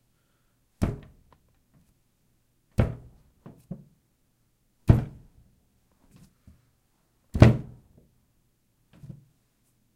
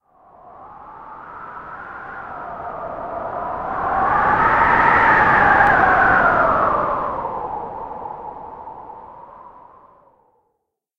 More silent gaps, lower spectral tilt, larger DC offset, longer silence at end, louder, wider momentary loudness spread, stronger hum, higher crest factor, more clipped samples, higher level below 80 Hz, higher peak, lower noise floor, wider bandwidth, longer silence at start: neither; first, -8.5 dB/octave vs -6.5 dB/octave; neither; first, 2.3 s vs 1.5 s; second, -25 LUFS vs -16 LUFS; first, 29 LU vs 23 LU; neither; first, 30 dB vs 18 dB; neither; about the same, -40 dBFS vs -42 dBFS; about the same, 0 dBFS vs -2 dBFS; second, -69 dBFS vs -74 dBFS; first, 10 kHz vs 8.4 kHz; first, 0.8 s vs 0.45 s